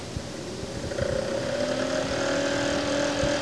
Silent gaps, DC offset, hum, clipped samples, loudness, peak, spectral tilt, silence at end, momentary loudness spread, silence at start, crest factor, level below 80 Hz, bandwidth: none; 0.3%; none; under 0.1%; -27 LUFS; -14 dBFS; -4 dB/octave; 0 s; 9 LU; 0 s; 14 dB; -46 dBFS; 11 kHz